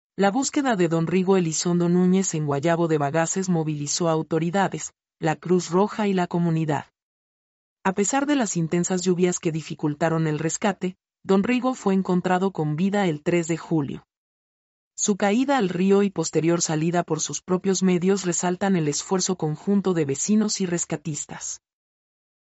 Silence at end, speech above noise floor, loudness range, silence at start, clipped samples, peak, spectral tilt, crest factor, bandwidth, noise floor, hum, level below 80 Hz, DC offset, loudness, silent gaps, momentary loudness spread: 0.9 s; over 68 dB; 3 LU; 0.2 s; under 0.1%; -8 dBFS; -5 dB/octave; 16 dB; 8.2 kHz; under -90 dBFS; none; -64 dBFS; under 0.1%; -23 LUFS; 7.02-7.77 s, 14.17-14.91 s; 7 LU